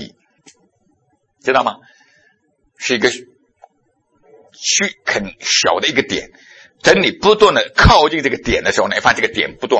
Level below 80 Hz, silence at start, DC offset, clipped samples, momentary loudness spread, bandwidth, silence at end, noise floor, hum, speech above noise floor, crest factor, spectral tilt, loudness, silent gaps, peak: -32 dBFS; 0 s; under 0.1%; under 0.1%; 12 LU; 9.8 kHz; 0 s; -62 dBFS; none; 48 dB; 16 dB; -3 dB/octave; -14 LUFS; none; 0 dBFS